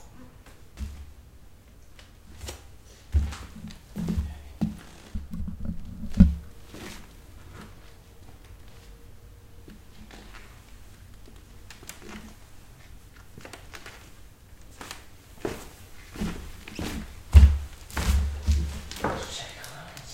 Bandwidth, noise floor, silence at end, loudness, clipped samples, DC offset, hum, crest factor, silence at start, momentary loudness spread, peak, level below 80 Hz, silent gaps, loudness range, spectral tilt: 16 kHz; -49 dBFS; 0 s; -28 LUFS; under 0.1%; under 0.1%; none; 28 dB; 0 s; 24 LU; -2 dBFS; -32 dBFS; none; 23 LU; -6 dB/octave